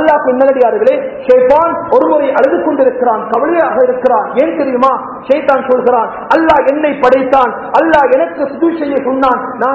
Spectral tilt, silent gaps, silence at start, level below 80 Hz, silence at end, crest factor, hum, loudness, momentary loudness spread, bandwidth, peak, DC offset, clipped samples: -7 dB/octave; none; 0 s; -46 dBFS; 0 s; 10 dB; none; -11 LUFS; 5 LU; 6.2 kHz; 0 dBFS; under 0.1%; 0.9%